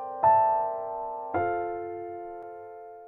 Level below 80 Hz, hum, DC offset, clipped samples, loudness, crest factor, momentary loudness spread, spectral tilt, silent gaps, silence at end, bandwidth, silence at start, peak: -64 dBFS; none; under 0.1%; under 0.1%; -27 LUFS; 18 dB; 20 LU; -10 dB/octave; none; 0 s; 3.7 kHz; 0 s; -10 dBFS